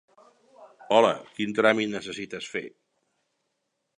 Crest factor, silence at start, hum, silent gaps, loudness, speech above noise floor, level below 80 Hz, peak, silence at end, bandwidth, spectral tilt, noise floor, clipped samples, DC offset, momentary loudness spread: 24 dB; 0.6 s; none; none; -25 LUFS; 53 dB; -72 dBFS; -4 dBFS; 1.3 s; 10.5 kHz; -4.5 dB/octave; -78 dBFS; under 0.1%; under 0.1%; 14 LU